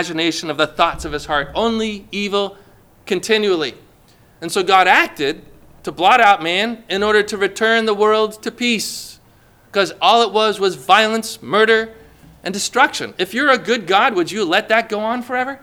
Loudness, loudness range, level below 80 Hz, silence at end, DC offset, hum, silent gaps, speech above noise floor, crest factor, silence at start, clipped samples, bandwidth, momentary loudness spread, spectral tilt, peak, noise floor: -16 LUFS; 5 LU; -48 dBFS; 0.05 s; under 0.1%; none; none; 33 dB; 18 dB; 0 s; under 0.1%; 18.5 kHz; 11 LU; -3 dB/octave; 0 dBFS; -50 dBFS